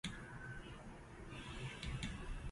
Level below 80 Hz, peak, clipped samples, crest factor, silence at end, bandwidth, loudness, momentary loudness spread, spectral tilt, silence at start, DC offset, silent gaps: -52 dBFS; -28 dBFS; under 0.1%; 20 dB; 0 s; 11.5 kHz; -50 LUFS; 9 LU; -4.5 dB/octave; 0.05 s; under 0.1%; none